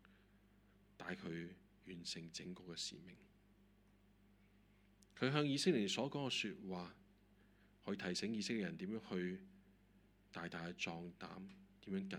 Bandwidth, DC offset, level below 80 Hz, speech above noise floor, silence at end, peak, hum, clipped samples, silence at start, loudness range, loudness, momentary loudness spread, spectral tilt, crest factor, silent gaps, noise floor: 14.5 kHz; under 0.1%; -76 dBFS; 27 dB; 0 s; -20 dBFS; 50 Hz at -70 dBFS; under 0.1%; 0.1 s; 10 LU; -44 LUFS; 18 LU; -4.5 dB/octave; 26 dB; none; -71 dBFS